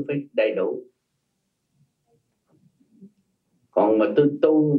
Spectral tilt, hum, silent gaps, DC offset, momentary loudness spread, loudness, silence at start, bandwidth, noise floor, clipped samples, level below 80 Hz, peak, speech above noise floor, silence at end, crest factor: -10 dB/octave; none; none; under 0.1%; 9 LU; -21 LUFS; 0 s; 4.8 kHz; -75 dBFS; under 0.1%; -78 dBFS; -6 dBFS; 55 dB; 0 s; 18 dB